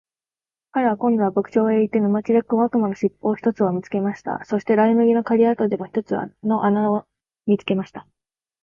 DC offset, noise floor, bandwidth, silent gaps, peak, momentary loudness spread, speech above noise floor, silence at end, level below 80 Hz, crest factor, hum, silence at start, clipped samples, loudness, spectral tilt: under 0.1%; under -90 dBFS; 7 kHz; none; -6 dBFS; 8 LU; over 70 dB; 0.6 s; -64 dBFS; 14 dB; none; 0.75 s; under 0.1%; -20 LUFS; -8.5 dB/octave